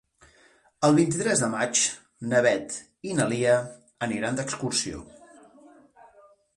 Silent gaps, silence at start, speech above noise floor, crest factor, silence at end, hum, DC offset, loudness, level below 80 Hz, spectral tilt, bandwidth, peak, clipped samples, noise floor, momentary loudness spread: none; 0.8 s; 35 dB; 18 dB; 1.5 s; none; under 0.1%; -25 LUFS; -60 dBFS; -4 dB/octave; 11.5 kHz; -8 dBFS; under 0.1%; -60 dBFS; 13 LU